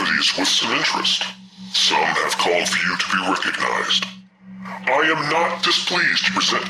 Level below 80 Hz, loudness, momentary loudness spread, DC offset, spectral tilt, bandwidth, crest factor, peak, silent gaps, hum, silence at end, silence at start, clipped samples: -64 dBFS; -18 LUFS; 6 LU; under 0.1%; -1.5 dB/octave; 15.5 kHz; 16 dB; -6 dBFS; none; none; 0 s; 0 s; under 0.1%